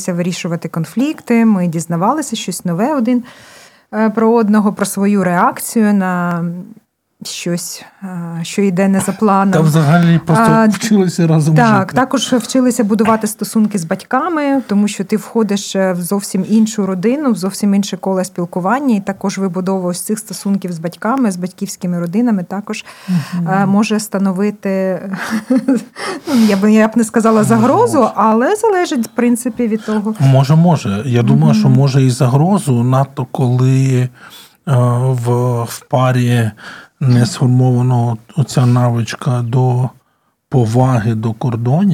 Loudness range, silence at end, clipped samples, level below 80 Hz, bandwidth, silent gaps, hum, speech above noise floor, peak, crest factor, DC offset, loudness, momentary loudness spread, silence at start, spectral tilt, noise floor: 5 LU; 0 s; under 0.1%; -56 dBFS; 16 kHz; none; none; 48 dB; 0 dBFS; 14 dB; under 0.1%; -14 LUFS; 9 LU; 0 s; -6.5 dB/octave; -61 dBFS